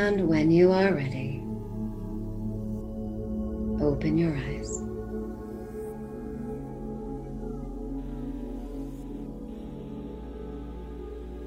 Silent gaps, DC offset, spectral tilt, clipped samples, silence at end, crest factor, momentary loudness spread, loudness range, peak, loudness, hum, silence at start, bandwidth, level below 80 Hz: none; under 0.1%; -7 dB/octave; under 0.1%; 0 s; 20 dB; 16 LU; 11 LU; -10 dBFS; -31 LUFS; none; 0 s; 15 kHz; -40 dBFS